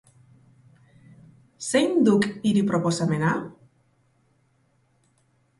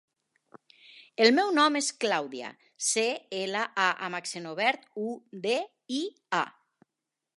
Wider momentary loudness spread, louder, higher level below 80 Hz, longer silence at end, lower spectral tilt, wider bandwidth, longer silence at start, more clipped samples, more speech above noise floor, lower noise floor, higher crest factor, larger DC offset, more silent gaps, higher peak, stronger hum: second, 10 LU vs 13 LU; first, -23 LUFS vs -28 LUFS; first, -66 dBFS vs -86 dBFS; first, 2.1 s vs 0.9 s; first, -5.5 dB/octave vs -2 dB/octave; about the same, 11.5 kHz vs 11.5 kHz; first, 1.6 s vs 0.95 s; neither; second, 44 dB vs 59 dB; second, -66 dBFS vs -87 dBFS; second, 20 dB vs 26 dB; neither; neither; second, -8 dBFS vs -4 dBFS; neither